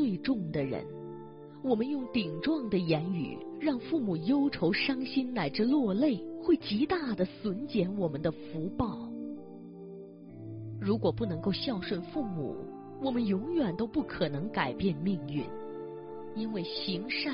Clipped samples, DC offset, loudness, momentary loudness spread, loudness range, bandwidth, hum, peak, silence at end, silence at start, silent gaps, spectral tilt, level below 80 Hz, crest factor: under 0.1%; under 0.1%; -32 LUFS; 14 LU; 6 LU; 5.6 kHz; none; -14 dBFS; 0 s; 0 s; none; -5 dB/octave; -60 dBFS; 18 dB